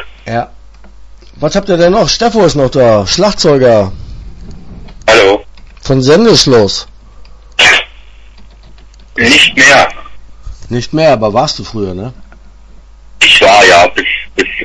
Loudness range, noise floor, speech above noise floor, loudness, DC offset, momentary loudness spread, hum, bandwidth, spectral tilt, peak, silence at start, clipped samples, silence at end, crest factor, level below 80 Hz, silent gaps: 2 LU; -34 dBFS; 27 dB; -8 LUFS; under 0.1%; 16 LU; none; 11 kHz; -3.5 dB/octave; 0 dBFS; 0 s; 1%; 0 s; 10 dB; -32 dBFS; none